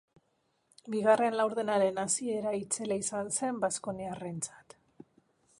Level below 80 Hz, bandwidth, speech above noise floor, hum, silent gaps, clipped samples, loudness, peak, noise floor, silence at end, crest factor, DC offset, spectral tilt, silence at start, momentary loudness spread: -74 dBFS; 11.5 kHz; 44 dB; none; none; under 0.1%; -31 LUFS; -14 dBFS; -76 dBFS; 1.05 s; 20 dB; under 0.1%; -3.5 dB/octave; 0.85 s; 12 LU